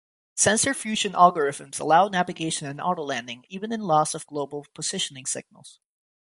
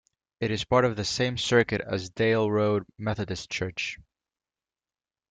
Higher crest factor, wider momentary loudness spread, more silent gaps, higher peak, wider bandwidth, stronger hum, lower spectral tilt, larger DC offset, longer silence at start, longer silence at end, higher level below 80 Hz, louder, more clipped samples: about the same, 22 dB vs 20 dB; first, 13 LU vs 9 LU; neither; first, -2 dBFS vs -8 dBFS; first, 11.5 kHz vs 9.4 kHz; neither; second, -3 dB/octave vs -5 dB/octave; neither; about the same, 0.35 s vs 0.4 s; second, 0.55 s vs 1.3 s; second, -64 dBFS vs -56 dBFS; first, -24 LUFS vs -27 LUFS; neither